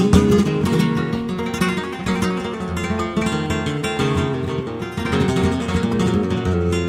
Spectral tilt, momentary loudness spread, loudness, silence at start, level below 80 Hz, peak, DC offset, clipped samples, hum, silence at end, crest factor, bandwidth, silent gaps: -6.5 dB/octave; 7 LU; -20 LUFS; 0 s; -36 dBFS; -2 dBFS; under 0.1%; under 0.1%; none; 0 s; 16 dB; 16 kHz; none